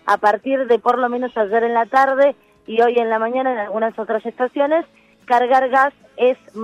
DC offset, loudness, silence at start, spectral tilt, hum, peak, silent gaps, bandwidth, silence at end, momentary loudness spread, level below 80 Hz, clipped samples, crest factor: under 0.1%; -18 LUFS; 0.05 s; -5 dB/octave; none; -4 dBFS; none; 10.5 kHz; 0 s; 7 LU; -68 dBFS; under 0.1%; 14 dB